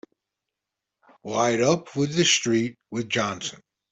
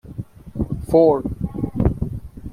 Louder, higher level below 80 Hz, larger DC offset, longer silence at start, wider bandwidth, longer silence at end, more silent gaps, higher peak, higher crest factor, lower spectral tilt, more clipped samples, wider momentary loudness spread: second, -23 LUFS vs -20 LUFS; second, -64 dBFS vs -34 dBFS; neither; first, 1.25 s vs 0.05 s; second, 8.4 kHz vs 14.5 kHz; first, 0.35 s vs 0 s; neither; second, -6 dBFS vs -2 dBFS; about the same, 20 dB vs 18 dB; second, -3.5 dB/octave vs -10 dB/octave; neither; second, 13 LU vs 19 LU